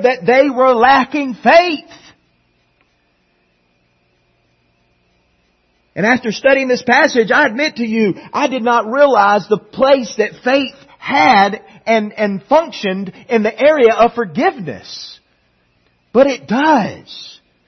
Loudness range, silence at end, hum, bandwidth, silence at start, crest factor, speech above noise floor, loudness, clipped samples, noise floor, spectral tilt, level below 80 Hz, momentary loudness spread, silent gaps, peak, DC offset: 5 LU; 0.35 s; none; 6.4 kHz; 0 s; 14 dB; 47 dB; -13 LUFS; under 0.1%; -60 dBFS; -5 dB/octave; -56 dBFS; 15 LU; none; 0 dBFS; under 0.1%